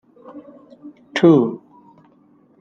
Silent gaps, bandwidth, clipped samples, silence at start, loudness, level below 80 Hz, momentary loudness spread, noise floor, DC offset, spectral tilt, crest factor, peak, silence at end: none; 7.2 kHz; under 0.1%; 0.35 s; -16 LUFS; -62 dBFS; 27 LU; -54 dBFS; under 0.1%; -7.5 dB/octave; 18 dB; -2 dBFS; 1.05 s